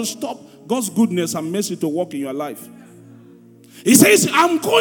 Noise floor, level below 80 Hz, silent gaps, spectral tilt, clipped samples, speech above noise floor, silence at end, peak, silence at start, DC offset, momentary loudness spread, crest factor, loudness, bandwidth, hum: -45 dBFS; -68 dBFS; none; -3.5 dB/octave; under 0.1%; 28 dB; 0 s; 0 dBFS; 0 s; under 0.1%; 18 LU; 18 dB; -17 LUFS; 19.5 kHz; none